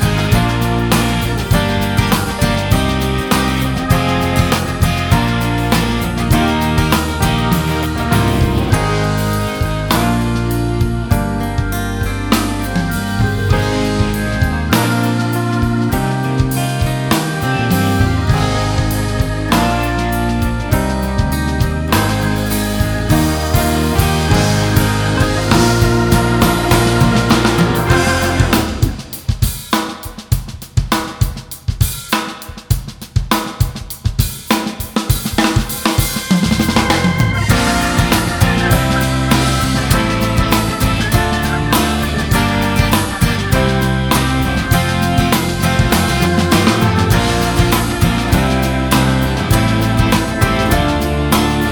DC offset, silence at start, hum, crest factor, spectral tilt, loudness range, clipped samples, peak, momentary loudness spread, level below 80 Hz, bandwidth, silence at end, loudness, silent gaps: under 0.1%; 0 s; none; 14 dB; -5 dB/octave; 4 LU; under 0.1%; 0 dBFS; 5 LU; -24 dBFS; 19.5 kHz; 0 s; -15 LUFS; none